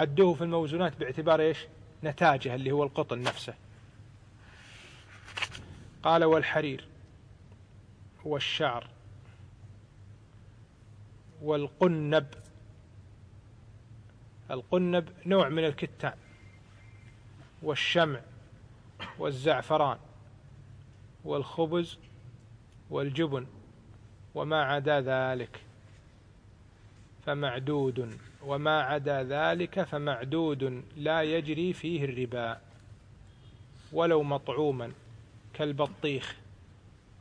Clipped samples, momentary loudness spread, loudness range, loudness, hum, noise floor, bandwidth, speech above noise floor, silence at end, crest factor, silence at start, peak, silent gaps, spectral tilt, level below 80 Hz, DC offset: under 0.1%; 19 LU; 6 LU; -30 LUFS; none; -56 dBFS; 10.5 kHz; 27 dB; 0.3 s; 22 dB; 0 s; -10 dBFS; none; -6.5 dB/octave; -62 dBFS; under 0.1%